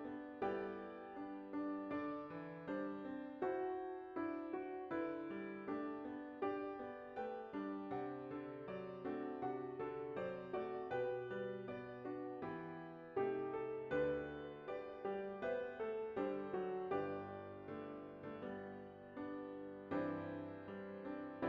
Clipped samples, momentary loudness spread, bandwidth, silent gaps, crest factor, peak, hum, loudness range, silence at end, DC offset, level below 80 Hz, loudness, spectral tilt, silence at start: under 0.1%; 8 LU; 5.8 kHz; none; 18 dB; -28 dBFS; none; 4 LU; 0 s; under 0.1%; -76 dBFS; -46 LUFS; -5.5 dB/octave; 0 s